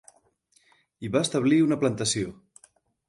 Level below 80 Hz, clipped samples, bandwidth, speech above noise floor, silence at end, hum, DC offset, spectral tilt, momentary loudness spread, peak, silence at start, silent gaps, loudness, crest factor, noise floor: -62 dBFS; under 0.1%; 11.5 kHz; 42 dB; 0.75 s; none; under 0.1%; -4.5 dB/octave; 11 LU; -10 dBFS; 1 s; none; -25 LUFS; 16 dB; -66 dBFS